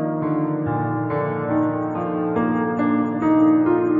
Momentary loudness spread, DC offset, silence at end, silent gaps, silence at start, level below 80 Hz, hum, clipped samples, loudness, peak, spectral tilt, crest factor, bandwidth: 7 LU; under 0.1%; 0 s; none; 0 s; -58 dBFS; none; under 0.1%; -21 LUFS; -8 dBFS; -10.5 dB/octave; 12 dB; 3.7 kHz